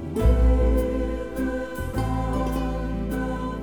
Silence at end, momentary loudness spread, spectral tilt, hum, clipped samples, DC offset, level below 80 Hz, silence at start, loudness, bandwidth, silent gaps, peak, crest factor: 0 s; 8 LU; -8 dB/octave; none; under 0.1%; under 0.1%; -26 dBFS; 0 s; -25 LUFS; 18 kHz; none; -8 dBFS; 16 dB